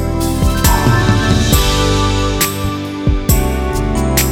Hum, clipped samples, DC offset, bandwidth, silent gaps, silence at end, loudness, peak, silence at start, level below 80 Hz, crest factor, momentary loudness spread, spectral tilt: none; under 0.1%; under 0.1%; over 20 kHz; none; 0 s; -14 LUFS; 0 dBFS; 0 s; -18 dBFS; 12 dB; 5 LU; -4.5 dB/octave